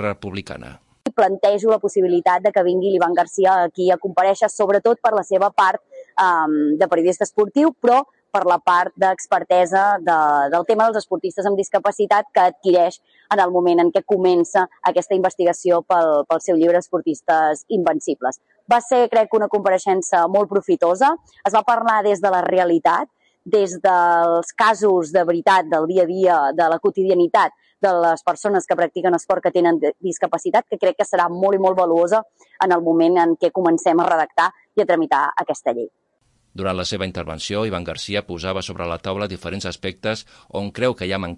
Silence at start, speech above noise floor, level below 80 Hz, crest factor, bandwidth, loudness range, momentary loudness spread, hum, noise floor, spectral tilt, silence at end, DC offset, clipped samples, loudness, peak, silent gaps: 0 s; 46 dB; -60 dBFS; 14 dB; 11 kHz; 5 LU; 9 LU; none; -64 dBFS; -5 dB/octave; 0 s; under 0.1%; under 0.1%; -18 LUFS; -4 dBFS; none